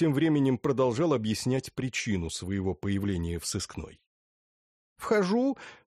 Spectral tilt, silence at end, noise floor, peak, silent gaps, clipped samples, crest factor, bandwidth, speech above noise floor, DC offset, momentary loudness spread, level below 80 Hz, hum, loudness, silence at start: -5.5 dB/octave; 0.2 s; under -90 dBFS; -14 dBFS; 4.07-4.96 s; under 0.1%; 16 dB; 14 kHz; over 62 dB; under 0.1%; 11 LU; -52 dBFS; none; -29 LUFS; 0 s